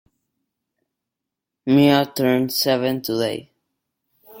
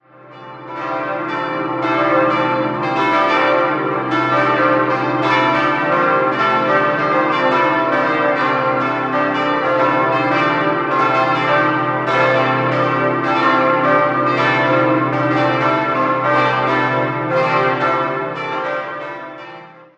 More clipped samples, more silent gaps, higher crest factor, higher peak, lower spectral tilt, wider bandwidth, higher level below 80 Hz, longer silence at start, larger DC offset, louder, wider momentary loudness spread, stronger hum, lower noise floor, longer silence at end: neither; neither; about the same, 20 dB vs 16 dB; about the same, -2 dBFS vs 0 dBFS; about the same, -5.5 dB/octave vs -6.5 dB/octave; first, 17 kHz vs 8.2 kHz; about the same, -64 dBFS vs -60 dBFS; first, 1.65 s vs 0.25 s; neither; second, -19 LUFS vs -16 LUFS; first, 11 LU vs 7 LU; neither; first, -84 dBFS vs -38 dBFS; second, 0 s vs 0.25 s